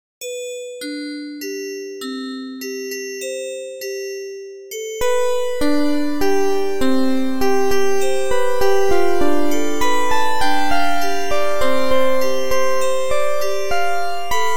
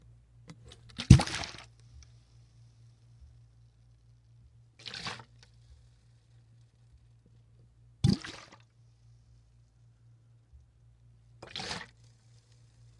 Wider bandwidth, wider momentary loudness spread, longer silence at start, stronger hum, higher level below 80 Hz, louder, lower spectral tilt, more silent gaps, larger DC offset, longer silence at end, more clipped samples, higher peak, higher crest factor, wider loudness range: first, 16 kHz vs 11.5 kHz; second, 10 LU vs 32 LU; second, 0.2 s vs 1 s; neither; about the same, -42 dBFS vs -46 dBFS; first, -21 LUFS vs -29 LUFS; second, -3.5 dB/octave vs -5.5 dB/octave; neither; neither; second, 0 s vs 1.15 s; neither; about the same, -2 dBFS vs -2 dBFS; second, 12 dB vs 34 dB; second, 8 LU vs 18 LU